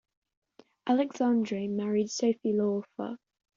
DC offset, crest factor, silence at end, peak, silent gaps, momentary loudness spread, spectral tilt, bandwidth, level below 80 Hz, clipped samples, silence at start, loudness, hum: under 0.1%; 16 dB; 0.4 s; -14 dBFS; none; 12 LU; -6 dB/octave; 7.6 kHz; -76 dBFS; under 0.1%; 0.85 s; -30 LUFS; none